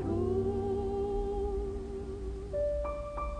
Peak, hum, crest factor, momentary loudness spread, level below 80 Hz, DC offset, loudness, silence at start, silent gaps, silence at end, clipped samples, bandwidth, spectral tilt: -20 dBFS; none; 14 dB; 8 LU; -40 dBFS; under 0.1%; -35 LUFS; 0 s; none; 0 s; under 0.1%; 10 kHz; -9 dB/octave